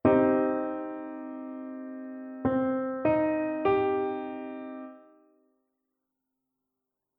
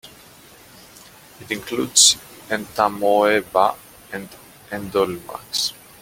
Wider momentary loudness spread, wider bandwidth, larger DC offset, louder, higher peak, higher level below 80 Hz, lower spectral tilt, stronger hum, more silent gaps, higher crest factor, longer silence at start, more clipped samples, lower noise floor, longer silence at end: second, 15 LU vs 21 LU; second, 4.3 kHz vs 17 kHz; neither; second, -29 LUFS vs -19 LUFS; second, -10 dBFS vs 0 dBFS; about the same, -62 dBFS vs -58 dBFS; first, -10.5 dB/octave vs -1 dB/octave; neither; neither; about the same, 20 dB vs 22 dB; about the same, 0.05 s vs 0.05 s; neither; first, -86 dBFS vs -46 dBFS; first, 2.2 s vs 0.3 s